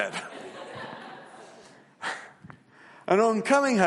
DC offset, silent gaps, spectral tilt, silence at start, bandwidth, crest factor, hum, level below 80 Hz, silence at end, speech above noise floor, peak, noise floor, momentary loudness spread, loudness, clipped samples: under 0.1%; none; -5 dB/octave; 0 s; 11.5 kHz; 22 dB; none; -76 dBFS; 0 s; 30 dB; -6 dBFS; -53 dBFS; 25 LU; -26 LUFS; under 0.1%